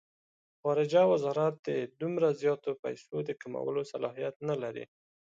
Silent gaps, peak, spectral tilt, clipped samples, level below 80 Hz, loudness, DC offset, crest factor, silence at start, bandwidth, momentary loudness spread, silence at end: 1.59-1.63 s, 2.79-2.83 s, 4.36-4.40 s; -14 dBFS; -7 dB/octave; under 0.1%; -80 dBFS; -32 LUFS; under 0.1%; 18 dB; 0.65 s; 7.8 kHz; 12 LU; 0.45 s